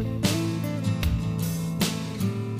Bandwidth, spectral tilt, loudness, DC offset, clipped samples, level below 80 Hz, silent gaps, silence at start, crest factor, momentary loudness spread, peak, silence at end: 15.5 kHz; -5.5 dB/octave; -27 LUFS; under 0.1%; under 0.1%; -38 dBFS; none; 0 s; 16 dB; 3 LU; -10 dBFS; 0 s